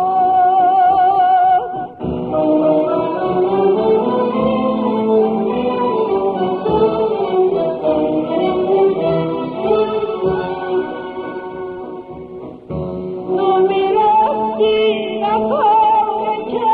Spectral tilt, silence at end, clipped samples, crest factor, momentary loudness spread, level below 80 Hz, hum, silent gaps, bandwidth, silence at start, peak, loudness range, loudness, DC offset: -9.5 dB/octave; 0 s; under 0.1%; 12 dB; 13 LU; -46 dBFS; none; none; 4.8 kHz; 0 s; -4 dBFS; 6 LU; -16 LUFS; under 0.1%